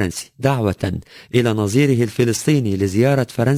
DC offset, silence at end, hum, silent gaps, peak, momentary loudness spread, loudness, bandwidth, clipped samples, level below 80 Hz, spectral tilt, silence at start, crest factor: under 0.1%; 0 s; none; none; -2 dBFS; 8 LU; -18 LUFS; 16 kHz; under 0.1%; -40 dBFS; -6 dB/octave; 0 s; 14 dB